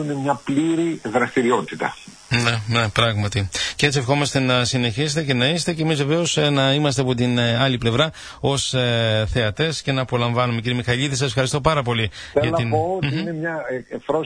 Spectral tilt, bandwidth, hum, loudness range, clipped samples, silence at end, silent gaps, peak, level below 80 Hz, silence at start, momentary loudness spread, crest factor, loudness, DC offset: -5 dB/octave; 10.5 kHz; none; 2 LU; under 0.1%; 0 s; none; -2 dBFS; -44 dBFS; 0 s; 5 LU; 18 dB; -20 LUFS; under 0.1%